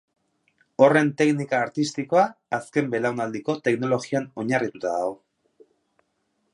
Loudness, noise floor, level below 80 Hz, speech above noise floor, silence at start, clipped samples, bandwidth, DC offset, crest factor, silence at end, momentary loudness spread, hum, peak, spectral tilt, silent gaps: -23 LUFS; -73 dBFS; -72 dBFS; 50 dB; 0.8 s; under 0.1%; 11.5 kHz; under 0.1%; 22 dB; 1.4 s; 10 LU; none; -2 dBFS; -6 dB/octave; none